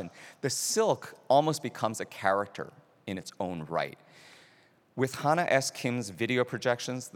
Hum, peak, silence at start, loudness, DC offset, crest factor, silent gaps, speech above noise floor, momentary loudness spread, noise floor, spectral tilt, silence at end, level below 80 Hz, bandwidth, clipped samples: none; -10 dBFS; 0 s; -30 LUFS; under 0.1%; 22 dB; none; 32 dB; 13 LU; -63 dBFS; -4 dB/octave; 0.05 s; -78 dBFS; 18.5 kHz; under 0.1%